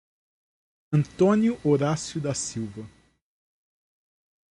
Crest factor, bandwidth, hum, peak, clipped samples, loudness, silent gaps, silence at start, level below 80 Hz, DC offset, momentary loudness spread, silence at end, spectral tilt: 18 dB; 11.5 kHz; none; -10 dBFS; under 0.1%; -25 LUFS; none; 0.9 s; -60 dBFS; under 0.1%; 13 LU; 1.65 s; -6 dB/octave